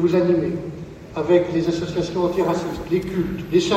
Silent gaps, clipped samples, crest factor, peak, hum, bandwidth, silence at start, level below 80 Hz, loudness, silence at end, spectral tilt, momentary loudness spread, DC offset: none; under 0.1%; 16 dB; -4 dBFS; none; 13.5 kHz; 0 s; -44 dBFS; -21 LUFS; 0 s; -6.5 dB/octave; 11 LU; under 0.1%